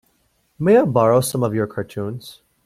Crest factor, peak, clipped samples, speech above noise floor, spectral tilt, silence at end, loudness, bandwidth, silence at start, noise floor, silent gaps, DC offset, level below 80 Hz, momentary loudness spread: 16 dB; -2 dBFS; under 0.1%; 46 dB; -6.5 dB/octave; 0.35 s; -18 LUFS; 15.5 kHz; 0.6 s; -64 dBFS; none; under 0.1%; -56 dBFS; 14 LU